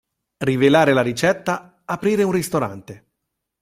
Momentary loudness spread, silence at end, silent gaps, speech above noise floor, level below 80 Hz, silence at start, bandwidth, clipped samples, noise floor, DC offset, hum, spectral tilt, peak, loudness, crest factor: 13 LU; 0.65 s; none; 60 dB; -56 dBFS; 0.4 s; 16 kHz; under 0.1%; -79 dBFS; under 0.1%; none; -5.5 dB/octave; -2 dBFS; -19 LUFS; 18 dB